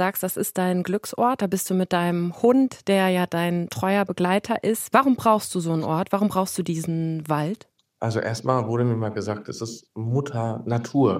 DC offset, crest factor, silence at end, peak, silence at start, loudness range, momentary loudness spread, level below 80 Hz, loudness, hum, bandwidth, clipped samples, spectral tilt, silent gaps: under 0.1%; 20 dB; 0 s; -2 dBFS; 0 s; 5 LU; 8 LU; -64 dBFS; -23 LUFS; none; 16 kHz; under 0.1%; -6 dB/octave; none